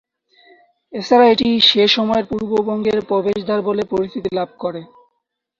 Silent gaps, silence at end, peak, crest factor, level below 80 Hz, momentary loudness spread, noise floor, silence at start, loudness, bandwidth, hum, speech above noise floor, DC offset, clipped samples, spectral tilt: none; 0.75 s; -2 dBFS; 16 dB; -52 dBFS; 15 LU; -74 dBFS; 0.9 s; -16 LUFS; 7.4 kHz; none; 58 dB; under 0.1%; under 0.1%; -5 dB/octave